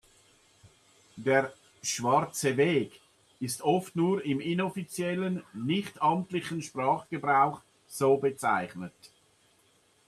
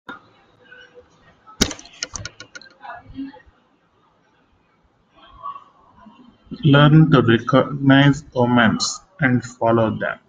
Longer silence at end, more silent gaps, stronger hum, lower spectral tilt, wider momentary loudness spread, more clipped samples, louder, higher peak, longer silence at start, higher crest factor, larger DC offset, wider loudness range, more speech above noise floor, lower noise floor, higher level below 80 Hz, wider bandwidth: first, 1 s vs 0.15 s; neither; neither; about the same, -5 dB/octave vs -5.5 dB/octave; second, 11 LU vs 25 LU; neither; second, -29 LUFS vs -17 LUFS; second, -10 dBFS vs 0 dBFS; first, 1.15 s vs 0.1 s; about the same, 20 dB vs 20 dB; neither; second, 2 LU vs 22 LU; second, 37 dB vs 45 dB; first, -66 dBFS vs -60 dBFS; second, -72 dBFS vs -48 dBFS; about the same, 14 kHz vs 15 kHz